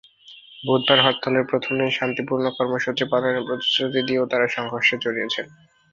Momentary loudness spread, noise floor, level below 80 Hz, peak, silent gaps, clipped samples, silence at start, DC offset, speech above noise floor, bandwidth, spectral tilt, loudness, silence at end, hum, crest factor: 8 LU; -47 dBFS; -64 dBFS; -2 dBFS; none; under 0.1%; 0.3 s; under 0.1%; 25 dB; 7.4 kHz; -5 dB/octave; -21 LUFS; 0.45 s; none; 20 dB